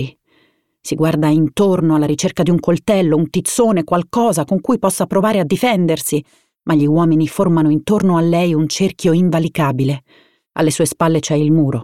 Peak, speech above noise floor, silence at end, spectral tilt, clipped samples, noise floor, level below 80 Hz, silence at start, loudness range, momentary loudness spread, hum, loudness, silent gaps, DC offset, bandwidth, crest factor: -2 dBFS; 44 dB; 0 s; -6 dB/octave; under 0.1%; -58 dBFS; -50 dBFS; 0 s; 1 LU; 5 LU; none; -15 LUFS; none; 0.3%; 16 kHz; 12 dB